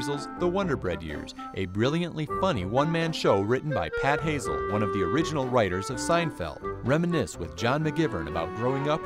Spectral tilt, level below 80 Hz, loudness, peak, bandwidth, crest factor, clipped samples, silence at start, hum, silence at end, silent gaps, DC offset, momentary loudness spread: -6 dB/octave; -48 dBFS; -27 LUFS; -8 dBFS; 15.5 kHz; 18 dB; under 0.1%; 0 s; none; 0 s; none; under 0.1%; 8 LU